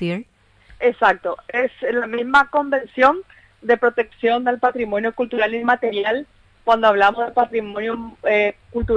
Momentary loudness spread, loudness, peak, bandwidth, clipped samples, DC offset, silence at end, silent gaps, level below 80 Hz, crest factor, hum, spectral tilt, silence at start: 10 LU; -19 LUFS; -2 dBFS; 9 kHz; under 0.1%; under 0.1%; 0 s; none; -44 dBFS; 16 dB; none; -6 dB/octave; 0 s